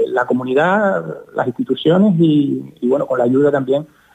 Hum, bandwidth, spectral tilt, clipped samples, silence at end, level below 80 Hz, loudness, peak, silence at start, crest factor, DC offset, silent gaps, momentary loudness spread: none; 9 kHz; -8.5 dB/octave; under 0.1%; 0.3 s; -62 dBFS; -16 LUFS; -4 dBFS; 0 s; 12 dB; under 0.1%; none; 9 LU